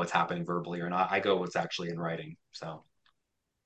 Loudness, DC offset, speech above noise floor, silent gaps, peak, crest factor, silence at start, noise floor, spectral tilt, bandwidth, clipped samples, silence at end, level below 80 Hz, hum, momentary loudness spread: -32 LUFS; under 0.1%; 50 dB; none; -12 dBFS; 20 dB; 0 s; -83 dBFS; -5.5 dB/octave; 8.8 kHz; under 0.1%; 0.85 s; -74 dBFS; none; 15 LU